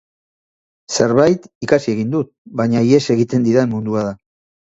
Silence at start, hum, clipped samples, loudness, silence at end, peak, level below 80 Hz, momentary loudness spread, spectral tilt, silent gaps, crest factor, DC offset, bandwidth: 0.9 s; none; under 0.1%; -16 LUFS; 0.6 s; 0 dBFS; -54 dBFS; 9 LU; -6 dB/octave; 1.55-1.61 s, 2.38-2.45 s; 18 dB; under 0.1%; 8 kHz